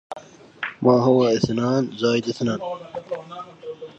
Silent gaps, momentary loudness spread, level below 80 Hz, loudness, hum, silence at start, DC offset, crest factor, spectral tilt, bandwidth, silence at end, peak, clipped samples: none; 19 LU; -58 dBFS; -21 LUFS; none; 0.1 s; under 0.1%; 20 dB; -6.5 dB/octave; 8.2 kHz; 0.1 s; -2 dBFS; under 0.1%